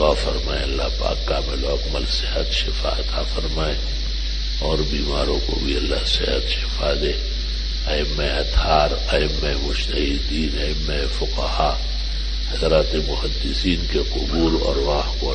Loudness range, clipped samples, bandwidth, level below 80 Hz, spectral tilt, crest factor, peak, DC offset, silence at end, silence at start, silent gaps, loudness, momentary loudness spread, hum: 2 LU; under 0.1%; 9 kHz; -24 dBFS; -5 dB/octave; 18 dB; -2 dBFS; under 0.1%; 0 s; 0 s; none; -22 LUFS; 6 LU; none